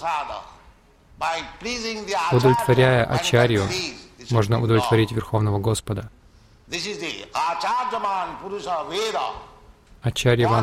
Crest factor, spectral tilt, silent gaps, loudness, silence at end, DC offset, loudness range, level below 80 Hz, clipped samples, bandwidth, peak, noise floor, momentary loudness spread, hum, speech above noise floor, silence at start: 18 dB; -5.5 dB/octave; none; -22 LUFS; 0 s; under 0.1%; 7 LU; -48 dBFS; under 0.1%; 15.5 kHz; -4 dBFS; -52 dBFS; 13 LU; none; 30 dB; 0 s